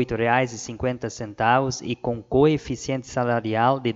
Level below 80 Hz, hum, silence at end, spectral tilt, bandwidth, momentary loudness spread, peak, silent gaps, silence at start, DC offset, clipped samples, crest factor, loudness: -48 dBFS; none; 0 s; -5.5 dB/octave; 8 kHz; 8 LU; -6 dBFS; none; 0 s; under 0.1%; under 0.1%; 18 dB; -23 LUFS